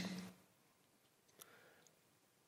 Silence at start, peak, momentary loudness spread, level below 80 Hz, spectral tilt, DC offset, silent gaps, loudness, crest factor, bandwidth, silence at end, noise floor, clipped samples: 0 s; -34 dBFS; 18 LU; under -90 dBFS; -4.5 dB/octave; under 0.1%; none; -55 LUFS; 22 dB; 16 kHz; 0.6 s; -75 dBFS; under 0.1%